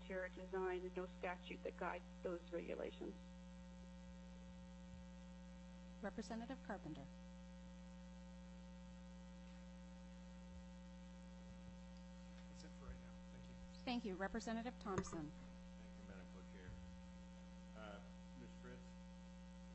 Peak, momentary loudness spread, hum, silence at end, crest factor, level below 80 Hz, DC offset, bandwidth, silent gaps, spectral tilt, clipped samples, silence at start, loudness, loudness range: -30 dBFS; 12 LU; none; 0 s; 22 dB; -62 dBFS; under 0.1%; 8.2 kHz; none; -6 dB/octave; under 0.1%; 0 s; -53 LUFS; 9 LU